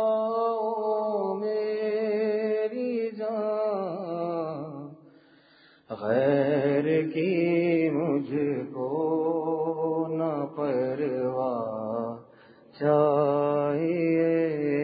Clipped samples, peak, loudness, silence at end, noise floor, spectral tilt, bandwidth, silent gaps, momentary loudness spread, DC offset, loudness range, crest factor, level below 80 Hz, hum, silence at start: under 0.1%; -12 dBFS; -27 LUFS; 0 s; -58 dBFS; -11.5 dB/octave; 5 kHz; none; 8 LU; under 0.1%; 4 LU; 16 dB; -74 dBFS; none; 0 s